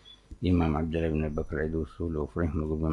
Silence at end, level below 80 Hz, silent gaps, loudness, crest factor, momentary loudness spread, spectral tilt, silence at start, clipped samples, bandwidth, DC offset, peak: 0 s; -42 dBFS; none; -30 LUFS; 16 dB; 7 LU; -9 dB/octave; 0.05 s; under 0.1%; 6.2 kHz; under 0.1%; -14 dBFS